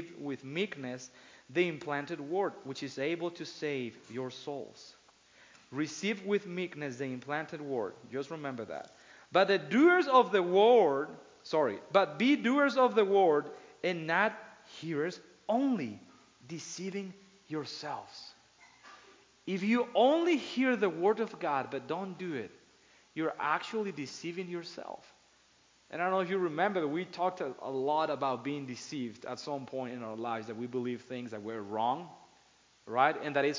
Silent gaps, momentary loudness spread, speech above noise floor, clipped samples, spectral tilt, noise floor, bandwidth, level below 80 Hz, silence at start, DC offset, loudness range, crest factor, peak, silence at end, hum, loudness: none; 17 LU; 34 dB; under 0.1%; -5 dB/octave; -66 dBFS; 7.6 kHz; -82 dBFS; 0 s; under 0.1%; 11 LU; 22 dB; -10 dBFS; 0 s; none; -32 LUFS